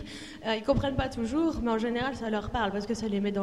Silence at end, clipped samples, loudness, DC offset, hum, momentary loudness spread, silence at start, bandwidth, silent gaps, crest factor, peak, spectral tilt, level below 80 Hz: 0 s; under 0.1%; -30 LUFS; 0.2%; none; 5 LU; 0 s; 12 kHz; none; 16 dB; -12 dBFS; -6 dB/octave; -44 dBFS